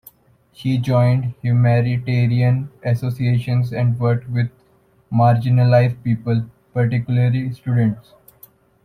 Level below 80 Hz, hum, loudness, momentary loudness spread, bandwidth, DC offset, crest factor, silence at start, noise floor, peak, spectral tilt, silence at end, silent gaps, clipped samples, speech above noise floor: -52 dBFS; none; -18 LUFS; 8 LU; 14 kHz; under 0.1%; 16 dB; 0.6 s; -56 dBFS; -2 dBFS; -9 dB/octave; 0.85 s; none; under 0.1%; 39 dB